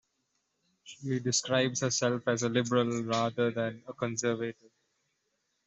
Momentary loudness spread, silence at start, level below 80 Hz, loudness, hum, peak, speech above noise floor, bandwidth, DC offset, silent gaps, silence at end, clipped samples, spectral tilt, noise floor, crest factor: 8 LU; 0.85 s; -72 dBFS; -30 LUFS; none; -14 dBFS; 48 dB; 8.2 kHz; under 0.1%; none; 1.15 s; under 0.1%; -4 dB/octave; -79 dBFS; 20 dB